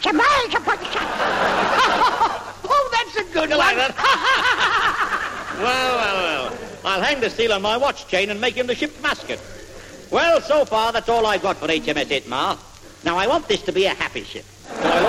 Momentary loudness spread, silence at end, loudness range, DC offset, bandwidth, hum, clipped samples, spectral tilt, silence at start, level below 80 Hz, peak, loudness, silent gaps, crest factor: 11 LU; 0 s; 3 LU; under 0.1%; 16 kHz; none; under 0.1%; -3 dB/octave; 0 s; -46 dBFS; -4 dBFS; -19 LUFS; none; 16 dB